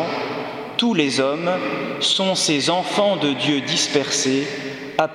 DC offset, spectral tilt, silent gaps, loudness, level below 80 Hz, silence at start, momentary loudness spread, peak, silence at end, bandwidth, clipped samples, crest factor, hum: under 0.1%; -3 dB/octave; none; -20 LUFS; -64 dBFS; 0 s; 8 LU; -2 dBFS; 0 s; 14.5 kHz; under 0.1%; 20 dB; none